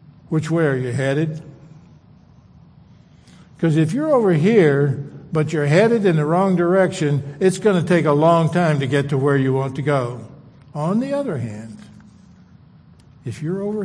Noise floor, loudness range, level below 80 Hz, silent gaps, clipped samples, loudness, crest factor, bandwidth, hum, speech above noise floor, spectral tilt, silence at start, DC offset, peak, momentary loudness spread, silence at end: -48 dBFS; 9 LU; -58 dBFS; none; under 0.1%; -18 LUFS; 18 dB; 10.5 kHz; none; 31 dB; -7.5 dB/octave; 0.3 s; under 0.1%; -2 dBFS; 14 LU; 0 s